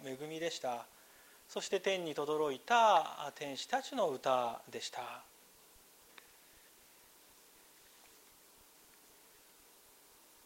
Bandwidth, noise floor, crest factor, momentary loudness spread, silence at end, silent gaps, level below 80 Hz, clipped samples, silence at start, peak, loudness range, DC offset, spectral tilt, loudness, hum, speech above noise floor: 16 kHz; -63 dBFS; 24 dB; 22 LU; 5.25 s; none; -82 dBFS; under 0.1%; 0 s; -16 dBFS; 16 LU; under 0.1%; -3 dB/octave; -36 LUFS; none; 27 dB